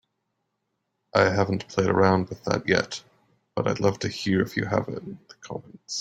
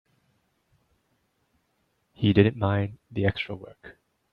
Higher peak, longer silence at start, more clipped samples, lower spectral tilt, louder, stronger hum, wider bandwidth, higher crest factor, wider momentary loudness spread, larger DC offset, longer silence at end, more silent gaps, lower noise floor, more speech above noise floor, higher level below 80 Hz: about the same, -4 dBFS vs -4 dBFS; second, 1.15 s vs 2.2 s; neither; second, -5.5 dB/octave vs -9.5 dB/octave; about the same, -25 LUFS vs -25 LUFS; neither; first, 13.5 kHz vs 5 kHz; about the same, 22 dB vs 24 dB; about the same, 17 LU vs 15 LU; neither; second, 0 s vs 0.4 s; neither; first, -78 dBFS vs -73 dBFS; first, 53 dB vs 48 dB; about the same, -58 dBFS vs -58 dBFS